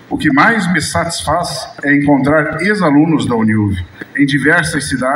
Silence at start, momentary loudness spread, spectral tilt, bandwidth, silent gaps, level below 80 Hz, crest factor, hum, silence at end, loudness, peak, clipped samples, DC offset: 0.1 s; 7 LU; -5 dB/octave; 15.5 kHz; none; -42 dBFS; 12 dB; none; 0 s; -13 LUFS; 0 dBFS; under 0.1%; under 0.1%